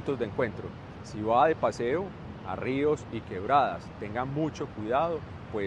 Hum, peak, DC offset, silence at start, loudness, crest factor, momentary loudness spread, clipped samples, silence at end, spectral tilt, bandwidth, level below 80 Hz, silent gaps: none; -10 dBFS; under 0.1%; 0 s; -29 LUFS; 18 dB; 14 LU; under 0.1%; 0 s; -7 dB/octave; 10 kHz; -54 dBFS; none